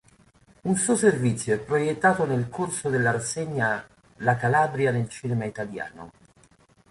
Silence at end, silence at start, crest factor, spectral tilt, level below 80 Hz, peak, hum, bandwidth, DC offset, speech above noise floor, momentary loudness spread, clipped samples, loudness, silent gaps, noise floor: 0.8 s; 0.65 s; 20 dB; -5.5 dB/octave; -60 dBFS; -6 dBFS; none; 11.5 kHz; under 0.1%; 34 dB; 11 LU; under 0.1%; -25 LUFS; none; -58 dBFS